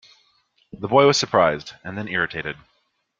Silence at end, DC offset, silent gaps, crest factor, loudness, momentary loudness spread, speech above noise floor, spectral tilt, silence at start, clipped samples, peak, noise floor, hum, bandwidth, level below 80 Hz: 0.65 s; under 0.1%; none; 20 dB; -20 LUFS; 17 LU; 48 dB; -4 dB/octave; 0.75 s; under 0.1%; -2 dBFS; -69 dBFS; none; 7.8 kHz; -58 dBFS